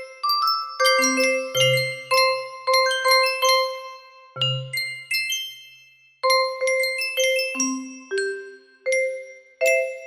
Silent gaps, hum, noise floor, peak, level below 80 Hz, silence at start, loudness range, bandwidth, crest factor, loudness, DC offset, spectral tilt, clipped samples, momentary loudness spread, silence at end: none; none; -53 dBFS; -6 dBFS; -74 dBFS; 0 s; 5 LU; 16 kHz; 16 dB; -21 LUFS; under 0.1%; -2 dB/octave; under 0.1%; 12 LU; 0 s